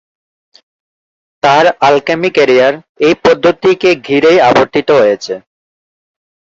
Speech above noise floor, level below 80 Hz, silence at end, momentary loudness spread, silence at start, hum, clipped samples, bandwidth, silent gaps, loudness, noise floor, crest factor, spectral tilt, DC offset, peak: over 81 dB; -50 dBFS; 1.2 s; 6 LU; 1.45 s; none; under 0.1%; 7.8 kHz; 2.89-2.95 s; -10 LUFS; under -90 dBFS; 12 dB; -5 dB/octave; under 0.1%; 0 dBFS